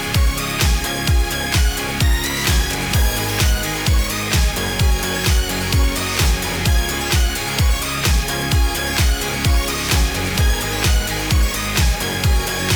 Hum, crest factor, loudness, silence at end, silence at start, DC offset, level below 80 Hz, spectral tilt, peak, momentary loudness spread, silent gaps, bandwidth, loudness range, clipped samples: none; 12 dB; -18 LUFS; 0 s; 0 s; under 0.1%; -20 dBFS; -3.5 dB/octave; -4 dBFS; 1 LU; none; over 20 kHz; 0 LU; under 0.1%